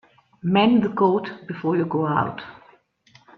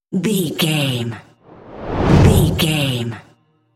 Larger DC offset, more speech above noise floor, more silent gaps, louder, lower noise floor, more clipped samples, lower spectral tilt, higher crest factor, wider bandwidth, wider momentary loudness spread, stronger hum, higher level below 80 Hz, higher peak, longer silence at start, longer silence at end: neither; first, 36 dB vs 22 dB; neither; second, -21 LUFS vs -16 LUFS; first, -56 dBFS vs -40 dBFS; neither; first, -9 dB/octave vs -5.5 dB/octave; about the same, 16 dB vs 18 dB; second, 5.8 kHz vs 16.5 kHz; about the same, 15 LU vs 17 LU; neither; second, -62 dBFS vs -30 dBFS; second, -6 dBFS vs 0 dBFS; first, 0.45 s vs 0.1 s; first, 0.85 s vs 0.55 s